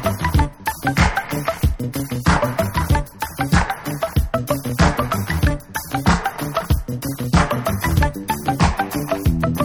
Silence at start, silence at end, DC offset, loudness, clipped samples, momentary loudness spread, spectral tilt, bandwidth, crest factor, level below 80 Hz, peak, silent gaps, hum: 0 s; 0 s; under 0.1%; -20 LUFS; under 0.1%; 6 LU; -5.5 dB/octave; 19.5 kHz; 16 dB; -26 dBFS; -2 dBFS; none; none